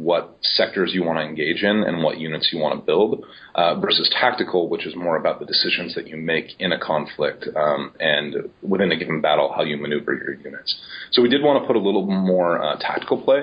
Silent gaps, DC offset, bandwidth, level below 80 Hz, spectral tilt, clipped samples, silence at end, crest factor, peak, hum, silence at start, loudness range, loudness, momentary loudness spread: none; under 0.1%; 5.2 kHz; -62 dBFS; -8.5 dB/octave; under 0.1%; 0 s; 18 dB; -2 dBFS; none; 0 s; 2 LU; -21 LUFS; 8 LU